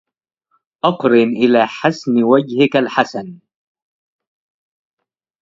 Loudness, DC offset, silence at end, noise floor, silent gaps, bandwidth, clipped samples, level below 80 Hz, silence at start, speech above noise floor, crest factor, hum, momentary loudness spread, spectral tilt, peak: -15 LUFS; under 0.1%; 2.05 s; -79 dBFS; none; 7.6 kHz; under 0.1%; -64 dBFS; 0.85 s; 65 dB; 18 dB; none; 7 LU; -6.5 dB/octave; 0 dBFS